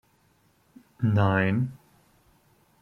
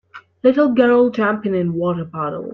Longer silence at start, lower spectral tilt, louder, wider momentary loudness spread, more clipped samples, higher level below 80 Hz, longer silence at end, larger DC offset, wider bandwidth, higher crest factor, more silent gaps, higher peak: first, 1 s vs 0.15 s; about the same, -9 dB/octave vs -9 dB/octave; second, -25 LUFS vs -17 LUFS; about the same, 8 LU vs 10 LU; neither; about the same, -62 dBFS vs -58 dBFS; first, 1.1 s vs 0 s; neither; about the same, 5.6 kHz vs 6 kHz; about the same, 20 dB vs 16 dB; neither; second, -8 dBFS vs -2 dBFS